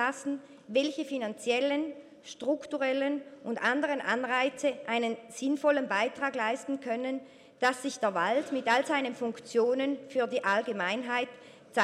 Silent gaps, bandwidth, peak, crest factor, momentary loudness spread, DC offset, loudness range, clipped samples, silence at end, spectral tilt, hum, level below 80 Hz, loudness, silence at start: none; 13.5 kHz; -12 dBFS; 18 dB; 9 LU; under 0.1%; 2 LU; under 0.1%; 0 s; -3.5 dB/octave; none; -82 dBFS; -31 LUFS; 0 s